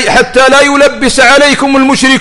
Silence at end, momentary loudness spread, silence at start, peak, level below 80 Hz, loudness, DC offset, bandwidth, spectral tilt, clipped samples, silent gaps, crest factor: 0 s; 4 LU; 0 s; 0 dBFS; -32 dBFS; -5 LUFS; under 0.1%; 12 kHz; -2.5 dB/octave; 1%; none; 6 dB